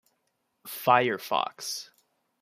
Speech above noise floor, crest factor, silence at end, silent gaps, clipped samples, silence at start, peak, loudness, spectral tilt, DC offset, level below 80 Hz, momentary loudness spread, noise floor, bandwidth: 50 dB; 24 dB; 0.55 s; none; under 0.1%; 0.65 s; -6 dBFS; -27 LUFS; -3 dB/octave; under 0.1%; -78 dBFS; 16 LU; -77 dBFS; 15.5 kHz